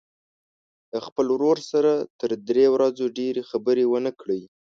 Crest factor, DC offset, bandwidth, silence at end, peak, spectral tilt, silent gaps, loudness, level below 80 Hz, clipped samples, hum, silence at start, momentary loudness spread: 16 dB; under 0.1%; 7.4 kHz; 0.2 s; -8 dBFS; -6 dB/octave; 1.12-1.16 s, 2.10-2.19 s; -23 LUFS; -70 dBFS; under 0.1%; none; 0.95 s; 11 LU